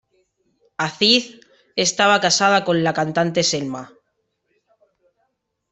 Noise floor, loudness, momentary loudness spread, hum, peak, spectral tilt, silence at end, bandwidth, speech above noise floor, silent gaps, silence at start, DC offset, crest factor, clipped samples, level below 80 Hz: -72 dBFS; -18 LUFS; 14 LU; none; -2 dBFS; -3 dB/octave; 1.85 s; 8.4 kHz; 54 dB; none; 0.8 s; under 0.1%; 20 dB; under 0.1%; -62 dBFS